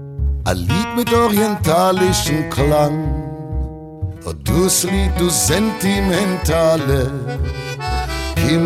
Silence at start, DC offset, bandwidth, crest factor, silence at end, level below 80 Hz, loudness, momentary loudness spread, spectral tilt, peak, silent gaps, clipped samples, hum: 0 s; under 0.1%; 16.5 kHz; 14 dB; 0 s; -26 dBFS; -17 LUFS; 11 LU; -4.5 dB/octave; -4 dBFS; none; under 0.1%; none